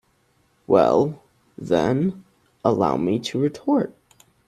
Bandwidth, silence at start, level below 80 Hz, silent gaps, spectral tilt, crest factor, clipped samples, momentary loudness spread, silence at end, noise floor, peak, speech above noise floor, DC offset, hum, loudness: 12.5 kHz; 0.7 s; -58 dBFS; none; -7 dB/octave; 20 dB; under 0.1%; 9 LU; 0.6 s; -64 dBFS; -2 dBFS; 44 dB; under 0.1%; none; -21 LUFS